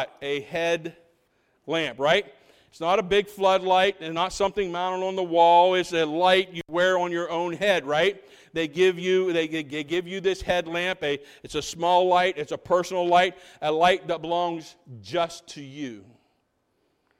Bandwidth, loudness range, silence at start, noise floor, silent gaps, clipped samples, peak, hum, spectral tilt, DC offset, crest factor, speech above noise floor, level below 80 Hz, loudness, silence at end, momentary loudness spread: 15 kHz; 4 LU; 0 s; -72 dBFS; none; under 0.1%; -6 dBFS; none; -4 dB/octave; under 0.1%; 18 dB; 48 dB; -56 dBFS; -24 LUFS; 1.2 s; 12 LU